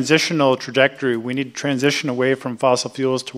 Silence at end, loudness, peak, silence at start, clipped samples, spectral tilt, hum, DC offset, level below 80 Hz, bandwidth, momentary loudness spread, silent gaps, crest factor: 0 s; -19 LUFS; 0 dBFS; 0 s; under 0.1%; -4.5 dB/octave; none; under 0.1%; -68 dBFS; 14 kHz; 6 LU; none; 18 dB